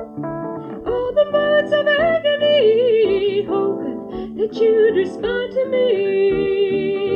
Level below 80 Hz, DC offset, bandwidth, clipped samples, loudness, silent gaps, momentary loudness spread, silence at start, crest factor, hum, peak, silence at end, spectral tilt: -48 dBFS; under 0.1%; 6.8 kHz; under 0.1%; -18 LUFS; none; 12 LU; 0 s; 12 dB; none; -6 dBFS; 0 s; -6.5 dB/octave